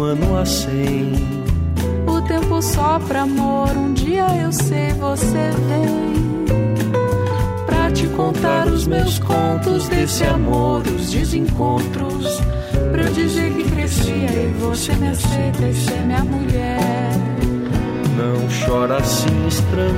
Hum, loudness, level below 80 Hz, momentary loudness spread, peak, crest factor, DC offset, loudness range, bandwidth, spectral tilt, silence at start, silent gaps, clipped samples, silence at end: none; -18 LUFS; -26 dBFS; 3 LU; -4 dBFS; 12 dB; under 0.1%; 1 LU; 16 kHz; -6 dB/octave; 0 s; none; under 0.1%; 0 s